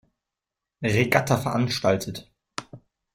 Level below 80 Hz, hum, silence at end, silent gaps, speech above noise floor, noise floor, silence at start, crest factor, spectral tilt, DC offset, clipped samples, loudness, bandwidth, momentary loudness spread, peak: -56 dBFS; none; 0.4 s; none; 64 dB; -87 dBFS; 0.8 s; 24 dB; -5.5 dB/octave; under 0.1%; under 0.1%; -23 LUFS; 16 kHz; 17 LU; -2 dBFS